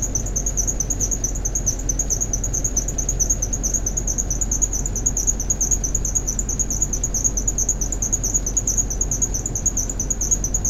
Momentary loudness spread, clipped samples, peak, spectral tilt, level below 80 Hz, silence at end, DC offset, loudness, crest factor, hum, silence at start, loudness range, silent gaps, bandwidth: 3 LU; under 0.1%; -4 dBFS; -3 dB/octave; -26 dBFS; 0 s; under 0.1%; -20 LUFS; 18 dB; none; 0 s; 1 LU; none; 15 kHz